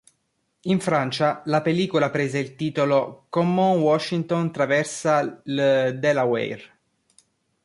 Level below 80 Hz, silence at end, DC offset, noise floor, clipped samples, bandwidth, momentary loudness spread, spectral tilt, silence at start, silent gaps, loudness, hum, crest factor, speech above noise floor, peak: -66 dBFS; 1 s; under 0.1%; -72 dBFS; under 0.1%; 11.5 kHz; 7 LU; -6 dB/octave; 0.65 s; none; -22 LUFS; none; 16 dB; 51 dB; -8 dBFS